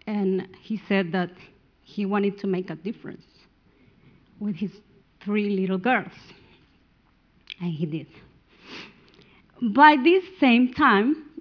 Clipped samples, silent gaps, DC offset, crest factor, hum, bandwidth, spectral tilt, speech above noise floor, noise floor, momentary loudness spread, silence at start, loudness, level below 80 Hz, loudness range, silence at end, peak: under 0.1%; none; under 0.1%; 22 dB; none; 5.4 kHz; -8 dB/octave; 39 dB; -62 dBFS; 21 LU; 0.05 s; -23 LUFS; -64 dBFS; 13 LU; 0.15 s; -2 dBFS